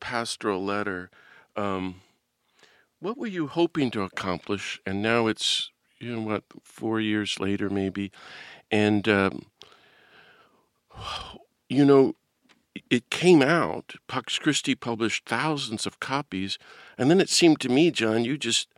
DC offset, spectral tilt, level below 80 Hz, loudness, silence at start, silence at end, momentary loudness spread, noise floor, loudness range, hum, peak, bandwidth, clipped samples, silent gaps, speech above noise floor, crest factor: under 0.1%; -4.5 dB/octave; -64 dBFS; -25 LUFS; 0 s; 0.15 s; 17 LU; -70 dBFS; 7 LU; none; -4 dBFS; 15 kHz; under 0.1%; none; 45 dB; 22 dB